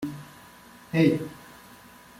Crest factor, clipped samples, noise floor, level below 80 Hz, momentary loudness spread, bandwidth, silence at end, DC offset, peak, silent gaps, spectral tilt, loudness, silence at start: 20 dB; under 0.1%; -50 dBFS; -64 dBFS; 26 LU; 16 kHz; 0.75 s; under 0.1%; -8 dBFS; none; -7 dB/octave; -25 LUFS; 0 s